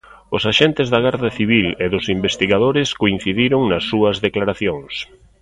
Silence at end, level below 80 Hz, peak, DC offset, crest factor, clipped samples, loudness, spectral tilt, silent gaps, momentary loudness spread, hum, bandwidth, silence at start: 0.4 s; -44 dBFS; 0 dBFS; under 0.1%; 18 dB; under 0.1%; -17 LUFS; -5.5 dB/octave; none; 8 LU; none; 11 kHz; 0.3 s